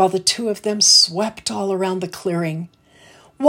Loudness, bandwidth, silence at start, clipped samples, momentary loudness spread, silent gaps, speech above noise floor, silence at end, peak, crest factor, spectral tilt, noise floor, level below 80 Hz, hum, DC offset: -17 LUFS; 16.5 kHz; 0 s; under 0.1%; 15 LU; none; 30 dB; 0 s; 0 dBFS; 18 dB; -2.5 dB/octave; -49 dBFS; -64 dBFS; none; under 0.1%